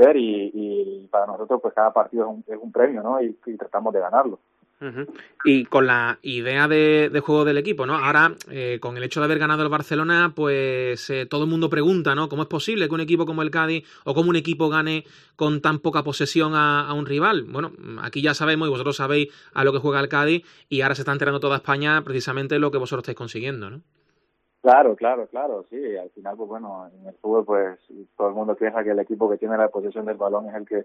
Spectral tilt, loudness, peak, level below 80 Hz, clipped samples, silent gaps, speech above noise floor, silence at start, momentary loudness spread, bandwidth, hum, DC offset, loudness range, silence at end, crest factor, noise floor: -6 dB/octave; -22 LUFS; -2 dBFS; -68 dBFS; under 0.1%; none; 48 dB; 0 s; 12 LU; 13.5 kHz; none; under 0.1%; 5 LU; 0 s; 20 dB; -70 dBFS